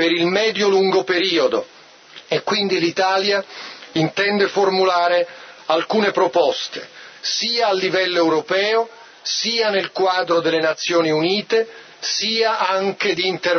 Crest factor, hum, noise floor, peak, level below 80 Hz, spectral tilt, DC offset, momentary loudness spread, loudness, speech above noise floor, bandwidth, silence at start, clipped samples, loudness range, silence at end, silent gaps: 16 dB; none; -43 dBFS; -4 dBFS; -72 dBFS; -3.5 dB/octave; under 0.1%; 9 LU; -18 LUFS; 25 dB; 6.6 kHz; 0 s; under 0.1%; 1 LU; 0 s; none